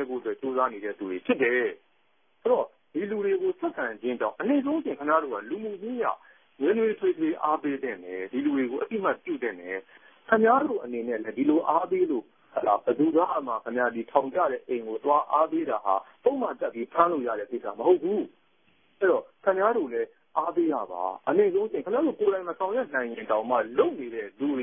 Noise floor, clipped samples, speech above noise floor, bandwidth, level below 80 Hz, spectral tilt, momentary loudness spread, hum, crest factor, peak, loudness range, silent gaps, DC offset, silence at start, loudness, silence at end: -70 dBFS; under 0.1%; 43 dB; 3.7 kHz; -76 dBFS; -10 dB/octave; 9 LU; none; 22 dB; -6 dBFS; 3 LU; none; under 0.1%; 0 s; -27 LUFS; 0 s